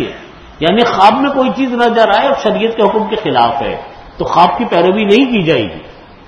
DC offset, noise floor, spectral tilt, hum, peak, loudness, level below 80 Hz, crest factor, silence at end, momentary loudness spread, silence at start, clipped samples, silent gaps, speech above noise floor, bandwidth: under 0.1%; -32 dBFS; -6 dB/octave; none; 0 dBFS; -11 LUFS; -42 dBFS; 12 dB; 0.25 s; 13 LU; 0 s; 0.3%; none; 21 dB; 10.5 kHz